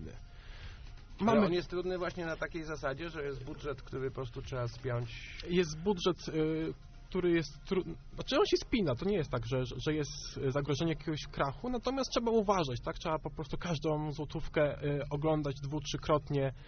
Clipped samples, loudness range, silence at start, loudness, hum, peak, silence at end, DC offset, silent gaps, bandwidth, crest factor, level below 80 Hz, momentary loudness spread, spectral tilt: under 0.1%; 4 LU; 0 s; -35 LUFS; none; -16 dBFS; 0 s; under 0.1%; none; 6.6 kHz; 18 dB; -48 dBFS; 11 LU; -5 dB/octave